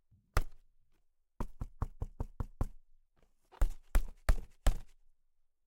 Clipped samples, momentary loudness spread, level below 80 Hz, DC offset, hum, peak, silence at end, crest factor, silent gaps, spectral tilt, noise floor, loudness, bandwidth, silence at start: under 0.1%; 10 LU; -38 dBFS; under 0.1%; none; -16 dBFS; 0.85 s; 20 dB; none; -5.5 dB/octave; -71 dBFS; -41 LUFS; 16.5 kHz; 0.35 s